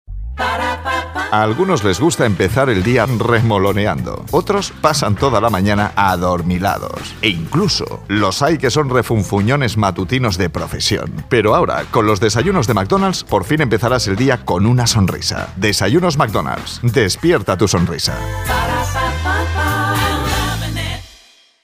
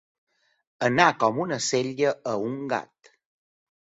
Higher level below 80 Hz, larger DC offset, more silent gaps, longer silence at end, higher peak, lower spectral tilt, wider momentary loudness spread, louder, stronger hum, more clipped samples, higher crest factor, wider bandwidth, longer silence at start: first, -32 dBFS vs -68 dBFS; neither; neither; second, 0.55 s vs 1.15 s; about the same, 0 dBFS vs -2 dBFS; about the same, -5 dB/octave vs -4 dB/octave; second, 6 LU vs 10 LU; first, -16 LUFS vs -25 LUFS; neither; neither; second, 16 dB vs 24 dB; first, 16 kHz vs 8 kHz; second, 0.1 s vs 0.8 s